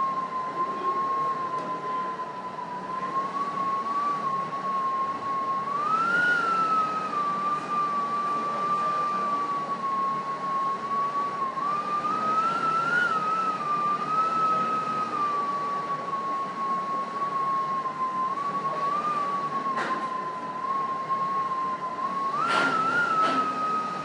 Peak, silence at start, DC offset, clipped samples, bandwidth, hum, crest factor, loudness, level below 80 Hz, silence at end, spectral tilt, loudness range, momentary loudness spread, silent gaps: -10 dBFS; 0 s; under 0.1%; under 0.1%; 11 kHz; none; 16 dB; -27 LUFS; -74 dBFS; 0 s; -4.5 dB/octave; 4 LU; 7 LU; none